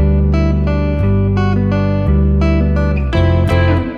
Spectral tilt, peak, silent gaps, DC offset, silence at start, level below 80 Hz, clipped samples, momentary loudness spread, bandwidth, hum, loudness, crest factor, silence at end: -9 dB/octave; -2 dBFS; none; under 0.1%; 0 s; -18 dBFS; under 0.1%; 3 LU; 6.4 kHz; none; -14 LUFS; 10 dB; 0 s